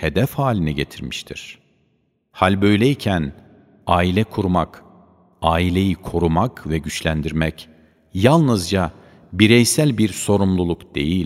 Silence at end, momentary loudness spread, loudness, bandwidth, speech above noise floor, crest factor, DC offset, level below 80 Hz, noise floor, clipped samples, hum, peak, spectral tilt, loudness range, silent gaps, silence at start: 0 s; 14 LU; -19 LUFS; 16 kHz; 47 dB; 20 dB; under 0.1%; -38 dBFS; -65 dBFS; under 0.1%; none; 0 dBFS; -5.5 dB/octave; 4 LU; none; 0 s